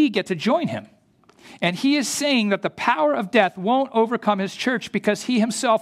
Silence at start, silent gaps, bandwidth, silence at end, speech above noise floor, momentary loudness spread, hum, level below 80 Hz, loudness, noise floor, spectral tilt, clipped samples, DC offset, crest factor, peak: 0 s; none; 15.5 kHz; 0 s; 35 dB; 4 LU; none; -68 dBFS; -21 LUFS; -56 dBFS; -4 dB/octave; under 0.1%; under 0.1%; 18 dB; -2 dBFS